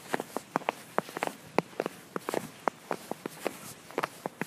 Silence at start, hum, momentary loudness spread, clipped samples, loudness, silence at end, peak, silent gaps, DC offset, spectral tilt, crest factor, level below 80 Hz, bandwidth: 0 s; none; 5 LU; under 0.1%; -36 LUFS; 0 s; -6 dBFS; none; under 0.1%; -4 dB/octave; 30 dB; -76 dBFS; 15.5 kHz